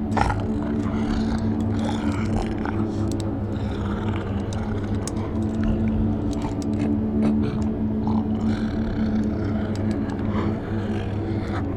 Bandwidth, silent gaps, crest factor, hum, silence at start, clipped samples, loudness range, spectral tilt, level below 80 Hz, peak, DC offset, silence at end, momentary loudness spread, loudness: 10.5 kHz; none; 20 dB; none; 0 s; under 0.1%; 2 LU; -7.5 dB/octave; -34 dBFS; -4 dBFS; under 0.1%; 0 s; 4 LU; -25 LUFS